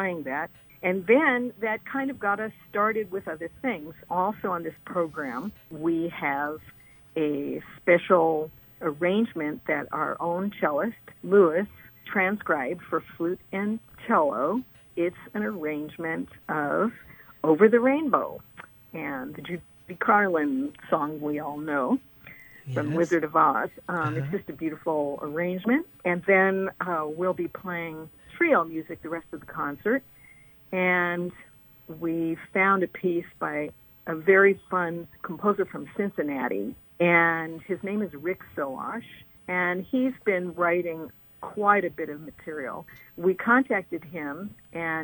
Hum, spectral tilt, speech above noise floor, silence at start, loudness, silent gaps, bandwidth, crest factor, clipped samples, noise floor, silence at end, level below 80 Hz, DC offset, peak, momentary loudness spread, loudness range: none; -8 dB/octave; 26 dB; 0 s; -26 LUFS; none; 19 kHz; 22 dB; under 0.1%; -53 dBFS; 0 s; -64 dBFS; under 0.1%; -4 dBFS; 15 LU; 4 LU